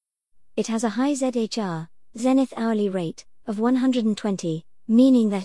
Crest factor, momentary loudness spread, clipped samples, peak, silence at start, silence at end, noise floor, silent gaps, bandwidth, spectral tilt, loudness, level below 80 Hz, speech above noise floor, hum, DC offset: 16 dB; 15 LU; under 0.1%; -8 dBFS; 0.55 s; 0 s; -53 dBFS; none; 12 kHz; -6 dB/octave; -23 LUFS; -66 dBFS; 32 dB; none; 0.3%